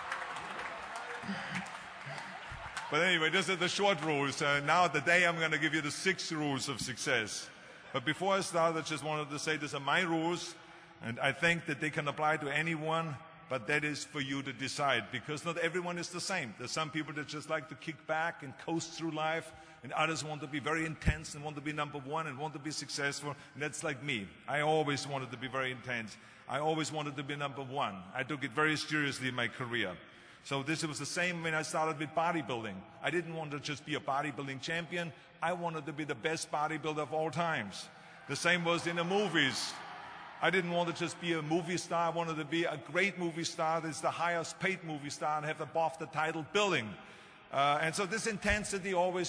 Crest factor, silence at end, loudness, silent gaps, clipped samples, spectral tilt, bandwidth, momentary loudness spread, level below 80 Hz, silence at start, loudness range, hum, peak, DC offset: 22 dB; 0 s; -34 LUFS; none; under 0.1%; -4 dB/octave; 11 kHz; 11 LU; -58 dBFS; 0 s; 6 LU; none; -14 dBFS; under 0.1%